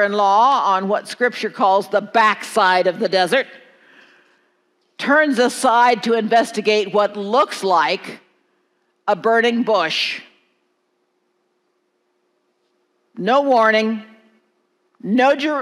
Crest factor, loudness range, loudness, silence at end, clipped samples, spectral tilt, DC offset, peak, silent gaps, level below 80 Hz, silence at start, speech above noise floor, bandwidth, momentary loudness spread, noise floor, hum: 16 dB; 6 LU; -17 LUFS; 0 s; under 0.1%; -4 dB/octave; under 0.1%; -2 dBFS; none; -82 dBFS; 0 s; 51 dB; 14.5 kHz; 9 LU; -68 dBFS; none